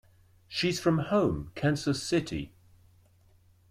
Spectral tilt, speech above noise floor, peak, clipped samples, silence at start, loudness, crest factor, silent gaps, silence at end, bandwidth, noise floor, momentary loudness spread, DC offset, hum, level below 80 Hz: -5.5 dB/octave; 33 dB; -12 dBFS; under 0.1%; 0.5 s; -29 LUFS; 18 dB; none; 1.25 s; 16 kHz; -62 dBFS; 11 LU; under 0.1%; none; -54 dBFS